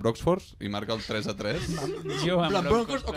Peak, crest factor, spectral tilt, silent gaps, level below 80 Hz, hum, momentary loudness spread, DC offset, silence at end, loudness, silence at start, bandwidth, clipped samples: -12 dBFS; 16 dB; -5.5 dB/octave; none; -46 dBFS; none; 7 LU; under 0.1%; 0 s; -28 LUFS; 0 s; 15.5 kHz; under 0.1%